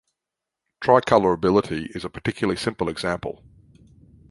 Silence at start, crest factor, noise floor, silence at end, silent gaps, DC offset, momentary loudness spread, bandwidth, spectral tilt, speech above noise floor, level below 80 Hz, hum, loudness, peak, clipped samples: 0.8 s; 22 dB; -86 dBFS; 1 s; none; under 0.1%; 13 LU; 11.5 kHz; -6 dB/octave; 64 dB; -50 dBFS; none; -22 LUFS; -2 dBFS; under 0.1%